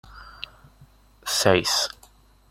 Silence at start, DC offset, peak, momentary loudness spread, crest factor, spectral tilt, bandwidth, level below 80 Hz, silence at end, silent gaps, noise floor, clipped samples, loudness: 0.1 s; under 0.1%; -2 dBFS; 21 LU; 24 dB; -2.5 dB/octave; 16.5 kHz; -54 dBFS; 0.6 s; none; -55 dBFS; under 0.1%; -22 LUFS